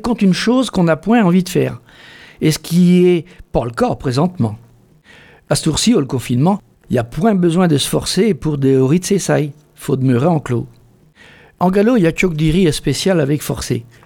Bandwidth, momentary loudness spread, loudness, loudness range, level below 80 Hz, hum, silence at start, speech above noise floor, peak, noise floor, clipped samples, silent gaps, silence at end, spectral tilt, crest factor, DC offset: 17.5 kHz; 9 LU; -15 LUFS; 3 LU; -38 dBFS; none; 0.05 s; 32 dB; 0 dBFS; -47 dBFS; under 0.1%; none; 0.25 s; -6 dB/octave; 16 dB; under 0.1%